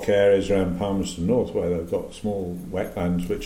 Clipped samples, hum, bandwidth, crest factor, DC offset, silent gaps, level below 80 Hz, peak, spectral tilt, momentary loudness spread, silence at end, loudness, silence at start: under 0.1%; none; 16 kHz; 16 dB; under 0.1%; none; -42 dBFS; -8 dBFS; -6.5 dB/octave; 11 LU; 0 s; -24 LUFS; 0 s